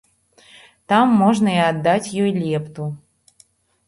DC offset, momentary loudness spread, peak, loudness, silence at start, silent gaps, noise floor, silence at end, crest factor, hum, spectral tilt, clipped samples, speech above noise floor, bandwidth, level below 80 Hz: under 0.1%; 15 LU; -4 dBFS; -18 LUFS; 0.9 s; none; -56 dBFS; 0.9 s; 16 dB; none; -6 dB/octave; under 0.1%; 39 dB; 11.5 kHz; -60 dBFS